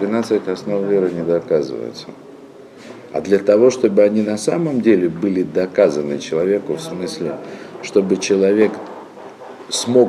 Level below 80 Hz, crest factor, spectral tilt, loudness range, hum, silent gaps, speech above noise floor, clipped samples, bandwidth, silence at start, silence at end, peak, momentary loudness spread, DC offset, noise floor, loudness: -62 dBFS; 16 dB; -5.5 dB/octave; 4 LU; none; none; 23 dB; under 0.1%; 13 kHz; 0 s; 0 s; -2 dBFS; 20 LU; under 0.1%; -39 dBFS; -17 LUFS